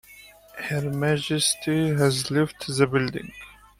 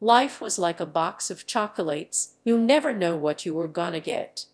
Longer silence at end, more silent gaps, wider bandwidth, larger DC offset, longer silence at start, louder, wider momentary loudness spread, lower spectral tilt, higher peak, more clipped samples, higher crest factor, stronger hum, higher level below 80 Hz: first, 0.25 s vs 0.1 s; neither; first, 16 kHz vs 11 kHz; neither; about the same, 0.1 s vs 0 s; about the same, -24 LUFS vs -25 LUFS; first, 14 LU vs 9 LU; about the same, -4.5 dB/octave vs -3.5 dB/octave; about the same, -6 dBFS vs -4 dBFS; neither; about the same, 18 dB vs 20 dB; neither; first, -56 dBFS vs -78 dBFS